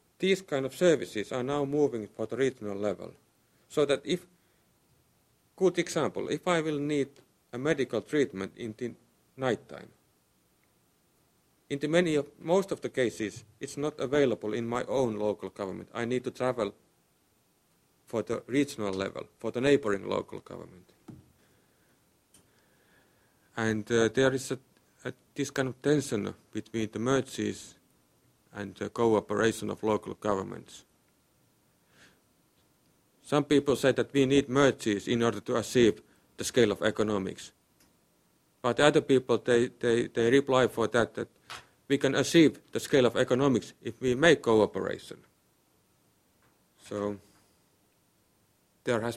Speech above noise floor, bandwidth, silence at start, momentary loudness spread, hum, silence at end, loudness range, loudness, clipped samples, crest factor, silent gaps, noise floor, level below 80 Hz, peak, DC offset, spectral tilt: 41 dB; 15 kHz; 0.2 s; 15 LU; none; 0 s; 9 LU; -29 LUFS; under 0.1%; 26 dB; none; -69 dBFS; -64 dBFS; -4 dBFS; under 0.1%; -5 dB/octave